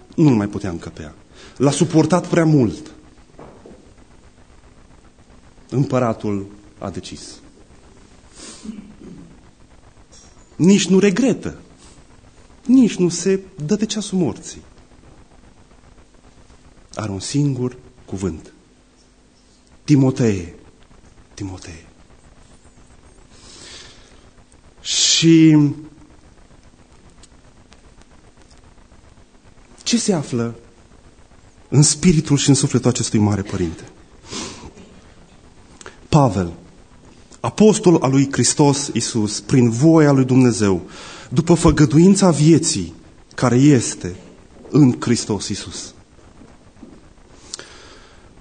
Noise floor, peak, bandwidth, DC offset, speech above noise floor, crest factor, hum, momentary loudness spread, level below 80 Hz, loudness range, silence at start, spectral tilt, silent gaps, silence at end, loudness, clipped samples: -52 dBFS; -2 dBFS; 9.6 kHz; under 0.1%; 36 dB; 18 dB; none; 22 LU; -44 dBFS; 13 LU; 0.15 s; -5.5 dB/octave; none; 0.8 s; -16 LUFS; under 0.1%